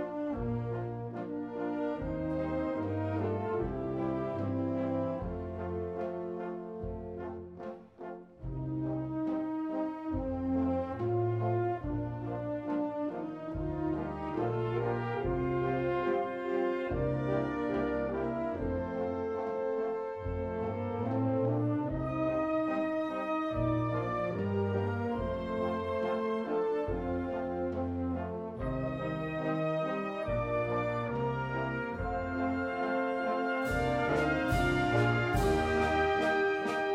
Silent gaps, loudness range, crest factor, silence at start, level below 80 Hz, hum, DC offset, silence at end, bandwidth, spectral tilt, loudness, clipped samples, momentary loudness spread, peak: none; 6 LU; 16 dB; 0 s; -48 dBFS; none; under 0.1%; 0 s; 15.5 kHz; -8 dB/octave; -33 LUFS; under 0.1%; 8 LU; -16 dBFS